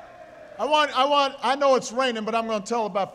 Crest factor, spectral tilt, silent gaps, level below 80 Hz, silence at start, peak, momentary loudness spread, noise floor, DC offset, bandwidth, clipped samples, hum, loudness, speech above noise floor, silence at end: 16 dB; -3 dB/octave; none; -66 dBFS; 0 s; -8 dBFS; 6 LU; -45 dBFS; under 0.1%; 13 kHz; under 0.1%; none; -23 LUFS; 22 dB; 0 s